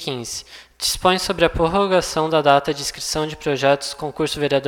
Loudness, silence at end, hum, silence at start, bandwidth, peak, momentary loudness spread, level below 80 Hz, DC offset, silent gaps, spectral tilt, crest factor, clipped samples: -19 LUFS; 0 s; none; 0 s; 18.5 kHz; 0 dBFS; 9 LU; -40 dBFS; under 0.1%; none; -3.5 dB/octave; 20 dB; under 0.1%